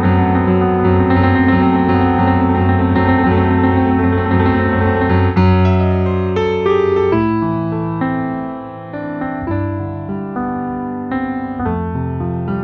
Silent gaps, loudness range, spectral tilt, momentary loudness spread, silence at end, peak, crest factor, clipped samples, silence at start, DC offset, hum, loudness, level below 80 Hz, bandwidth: none; 8 LU; -10 dB/octave; 10 LU; 0 s; -2 dBFS; 12 dB; under 0.1%; 0 s; under 0.1%; none; -15 LUFS; -36 dBFS; 4.9 kHz